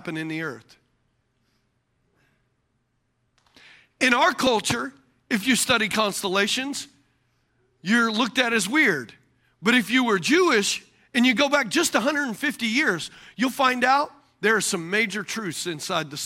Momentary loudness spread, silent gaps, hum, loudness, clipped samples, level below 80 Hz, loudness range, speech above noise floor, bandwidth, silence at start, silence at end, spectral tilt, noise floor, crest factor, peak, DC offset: 11 LU; none; none; -22 LUFS; under 0.1%; -64 dBFS; 4 LU; 49 dB; 16.5 kHz; 0.05 s; 0 s; -3 dB/octave; -72 dBFS; 20 dB; -4 dBFS; under 0.1%